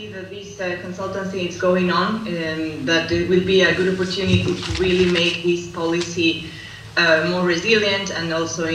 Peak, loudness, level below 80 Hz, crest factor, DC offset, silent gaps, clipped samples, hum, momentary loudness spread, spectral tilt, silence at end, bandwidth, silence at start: -2 dBFS; -19 LUFS; -44 dBFS; 18 dB; under 0.1%; none; under 0.1%; none; 11 LU; -4.5 dB/octave; 0 s; 11 kHz; 0 s